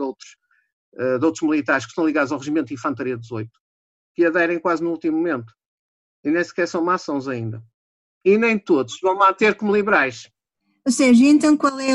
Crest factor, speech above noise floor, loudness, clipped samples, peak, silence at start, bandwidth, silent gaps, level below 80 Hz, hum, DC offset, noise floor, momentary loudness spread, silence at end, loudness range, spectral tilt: 16 dB; 52 dB; -19 LUFS; under 0.1%; -4 dBFS; 0 s; 11.5 kHz; 0.73-0.92 s, 3.60-4.15 s, 5.68-6.23 s, 7.74-8.21 s; -64 dBFS; none; under 0.1%; -71 dBFS; 14 LU; 0 s; 6 LU; -5 dB/octave